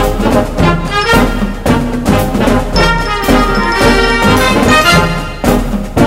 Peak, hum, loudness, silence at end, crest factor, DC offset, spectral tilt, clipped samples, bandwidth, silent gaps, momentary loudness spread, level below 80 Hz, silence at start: 0 dBFS; none; -10 LUFS; 0 s; 10 dB; under 0.1%; -5 dB/octave; 0.3%; 16.5 kHz; none; 6 LU; -18 dBFS; 0 s